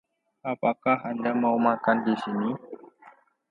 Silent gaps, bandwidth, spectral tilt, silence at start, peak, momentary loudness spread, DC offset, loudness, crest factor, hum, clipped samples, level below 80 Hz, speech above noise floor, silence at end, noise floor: none; 5.4 kHz; -8 dB/octave; 0.45 s; -8 dBFS; 15 LU; under 0.1%; -26 LUFS; 20 dB; none; under 0.1%; -76 dBFS; 30 dB; 0.4 s; -55 dBFS